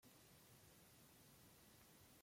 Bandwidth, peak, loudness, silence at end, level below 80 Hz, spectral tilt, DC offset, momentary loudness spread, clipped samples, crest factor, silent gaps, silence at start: 16.5 kHz; -54 dBFS; -67 LUFS; 0 s; -84 dBFS; -3 dB/octave; under 0.1%; 0 LU; under 0.1%; 14 dB; none; 0 s